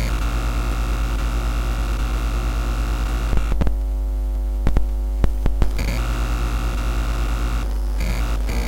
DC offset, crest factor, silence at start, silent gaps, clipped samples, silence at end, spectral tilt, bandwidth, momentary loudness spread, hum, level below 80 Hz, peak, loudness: under 0.1%; 18 dB; 0 s; none; under 0.1%; 0 s; -5.5 dB/octave; 16.5 kHz; 2 LU; none; -20 dBFS; -2 dBFS; -24 LUFS